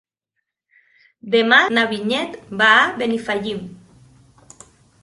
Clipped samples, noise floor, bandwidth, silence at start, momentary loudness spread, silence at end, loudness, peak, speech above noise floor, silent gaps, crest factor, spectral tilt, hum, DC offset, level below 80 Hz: under 0.1%; -78 dBFS; 11.5 kHz; 1.25 s; 15 LU; 1.3 s; -17 LUFS; 0 dBFS; 61 dB; none; 20 dB; -4 dB/octave; none; under 0.1%; -60 dBFS